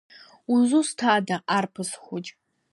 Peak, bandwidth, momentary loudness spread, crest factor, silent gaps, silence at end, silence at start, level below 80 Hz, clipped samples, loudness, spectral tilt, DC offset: -6 dBFS; 11.5 kHz; 15 LU; 18 dB; none; 0.45 s; 0.5 s; -78 dBFS; under 0.1%; -24 LUFS; -4 dB/octave; under 0.1%